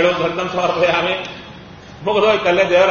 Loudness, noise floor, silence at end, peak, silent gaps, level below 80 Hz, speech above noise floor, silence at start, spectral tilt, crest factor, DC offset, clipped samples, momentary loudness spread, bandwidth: -16 LUFS; -37 dBFS; 0 s; -2 dBFS; none; -48 dBFS; 21 dB; 0 s; -2.5 dB/octave; 14 dB; under 0.1%; under 0.1%; 19 LU; 7 kHz